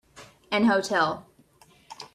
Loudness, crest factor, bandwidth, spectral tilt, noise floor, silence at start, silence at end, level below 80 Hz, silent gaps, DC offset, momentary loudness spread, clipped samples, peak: -24 LUFS; 18 dB; 13.5 kHz; -4.5 dB/octave; -58 dBFS; 0.15 s; 0.1 s; -66 dBFS; none; under 0.1%; 16 LU; under 0.1%; -10 dBFS